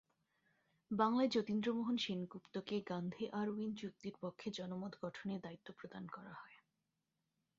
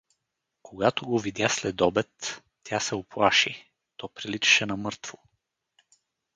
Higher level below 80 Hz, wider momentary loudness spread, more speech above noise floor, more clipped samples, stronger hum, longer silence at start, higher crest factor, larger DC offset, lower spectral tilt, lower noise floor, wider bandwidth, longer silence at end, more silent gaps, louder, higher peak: second, -82 dBFS vs -60 dBFS; second, 17 LU vs 20 LU; second, 47 dB vs 56 dB; neither; neither; first, 0.9 s vs 0.65 s; about the same, 22 dB vs 22 dB; neither; first, -4.5 dB/octave vs -3 dB/octave; first, -88 dBFS vs -82 dBFS; second, 7.4 kHz vs 10 kHz; second, 1.05 s vs 1.25 s; neither; second, -42 LUFS vs -25 LUFS; second, -20 dBFS vs -6 dBFS